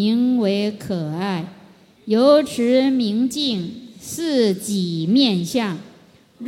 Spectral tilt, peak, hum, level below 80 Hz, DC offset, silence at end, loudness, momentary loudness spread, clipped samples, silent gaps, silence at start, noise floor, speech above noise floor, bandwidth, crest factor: -5.5 dB/octave; -4 dBFS; none; -62 dBFS; under 0.1%; 0 s; -19 LUFS; 14 LU; under 0.1%; none; 0 s; -50 dBFS; 31 dB; 16.5 kHz; 16 dB